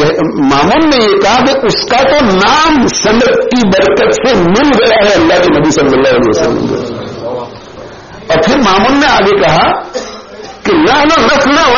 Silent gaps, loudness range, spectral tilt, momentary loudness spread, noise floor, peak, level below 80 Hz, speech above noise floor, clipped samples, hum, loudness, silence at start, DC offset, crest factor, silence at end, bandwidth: none; 4 LU; -3 dB/octave; 14 LU; -28 dBFS; 0 dBFS; -32 dBFS; 21 dB; under 0.1%; none; -8 LUFS; 0 s; under 0.1%; 8 dB; 0 s; 7.4 kHz